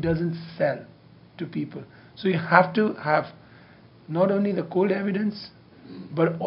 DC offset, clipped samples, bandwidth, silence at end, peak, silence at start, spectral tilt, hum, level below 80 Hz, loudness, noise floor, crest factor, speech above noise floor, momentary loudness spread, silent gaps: under 0.1%; under 0.1%; 5.6 kHz; 0 s; 0 dBFS; 0 s; -9.5 dB/octave; none; -58 dBFS; -25 LUFS; -51 dBFS; 26 dB; 27 dB; 21 LU; none